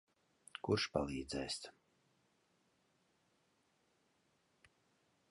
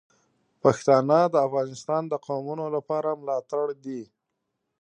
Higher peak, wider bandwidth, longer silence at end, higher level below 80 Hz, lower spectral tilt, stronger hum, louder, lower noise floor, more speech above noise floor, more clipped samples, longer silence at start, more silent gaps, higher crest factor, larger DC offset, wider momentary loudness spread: second, -20 dBFS vs -4 dBFS; first, 11.5 kHz vs 10 kHz; first, 3.6 s vs 0.8 s; first, -66 dBFS vs -72 dBFS; second, -4.5 dB/octave vs -6.5 dB/octave; neither; second, -41 LUFS vs -25 LUFS; about the same, -78 dBFS vs -80 dBFS; second, 38 dB vs 56 dB; neither; about the same, 0.65 s vs 0.65 s; neither; about the same, 26 dB vs 22 dB; neither; first, 15 LU vs 11 LU